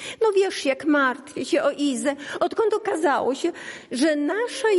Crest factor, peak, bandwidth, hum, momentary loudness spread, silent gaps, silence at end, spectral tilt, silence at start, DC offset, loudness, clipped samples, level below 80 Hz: 12 dB; -10 dBFS; 11.5 kHz; none; 7 LU; none; 0 s; -3 dB/octave; 0 s; under 0.1%; -23 LUFS; under 0.1%; -72 dBFS